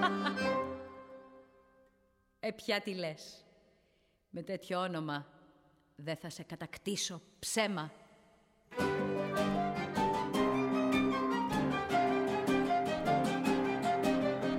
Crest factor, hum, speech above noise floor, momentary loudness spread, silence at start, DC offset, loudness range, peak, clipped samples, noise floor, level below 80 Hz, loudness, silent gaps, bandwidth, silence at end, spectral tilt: 18 dB; none; 35 dB; 14 LU; 0 s; under 0.1%; 10 LU; -18 dBFS; under 0.1%; -73 dBFS; -62 dBFS; -34 LUFS; none; 16 kHz; 0 s; -5 dB/octave